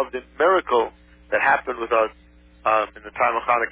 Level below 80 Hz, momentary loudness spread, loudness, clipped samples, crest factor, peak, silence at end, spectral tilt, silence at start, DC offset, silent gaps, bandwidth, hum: -52 dBFS; 8 LU; -22 LUFS; under 0.1%; 16 dB; -6 dBFS; 0 s; -7.5 dB/octave; 0 s; under 0.1%; none; 4 kHz; none